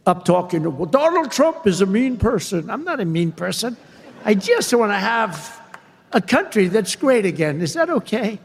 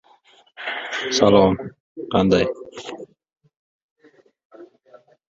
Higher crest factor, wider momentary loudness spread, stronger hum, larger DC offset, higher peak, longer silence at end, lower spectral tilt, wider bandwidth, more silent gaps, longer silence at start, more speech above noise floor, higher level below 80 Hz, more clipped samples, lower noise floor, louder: about the same, 18 dB vs 22 dB; second, 7 LU vs 21 LU; neither; neither; about the same, 0 dBFS vs -2 dBFS; second, 0.05 s vs 0.65 s; about the same, -5 dB/octave vs -5 dB/octave; first, 16 kHz vs 7.8 kHz; second, none vs 1.80-1.95 s, 3.57-3.96 s, 4.45-4.50 s; second, 0.05 s vs 0.6 s; second, 26 dB vs 37 dB; first, -44 dBFS vs -50 dBFS; neither; second, -44 dBFS vs -56 dBFS; about the same, -19 LUFS vs -19 LUFS